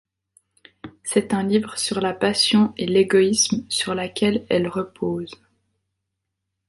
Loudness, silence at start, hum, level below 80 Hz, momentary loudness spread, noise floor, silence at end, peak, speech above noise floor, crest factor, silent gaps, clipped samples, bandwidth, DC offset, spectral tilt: -21 LUFS; 0.85 s; none; -58 dBFS; 10 LU; -80 dBFS; 1.35 s; -4 dBFS; 59 dB; 18 dB; none; under 0.1%; 11.5 kHz; under 0.1%; -4 dB/octave